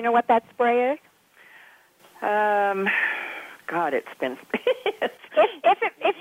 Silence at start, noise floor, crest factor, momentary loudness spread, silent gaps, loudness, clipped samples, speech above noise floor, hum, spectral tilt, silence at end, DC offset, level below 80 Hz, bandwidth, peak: 0 s; -54 dBFS; 16 dB; 11 LU; none; -24 LUFS; under 0.1%; 31 dB; none; -5 dB/octave; 0 s; under 0.1%; -76 dBFS; 16 kHz; -8 dBFS